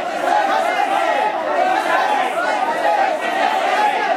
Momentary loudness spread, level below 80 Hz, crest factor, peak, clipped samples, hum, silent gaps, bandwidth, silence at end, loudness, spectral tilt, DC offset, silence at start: 2 LU; -72 dBFS; 14 dB; -4 dBFS; under 0.1%; none; none; 16 kHz; 0 s; -17 LUFS; -2 dB/octave; under 0.1%; 0 s